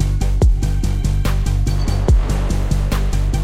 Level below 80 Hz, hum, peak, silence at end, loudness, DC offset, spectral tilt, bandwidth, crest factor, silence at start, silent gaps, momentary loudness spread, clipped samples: -16 dBFS; none; -4 dBFS; 0 s; -19 LUFS; under 0.1%; -6.5 dB/octave; 15 kHz; 12 dB; 0 s; none; 3 LU; under 0.1%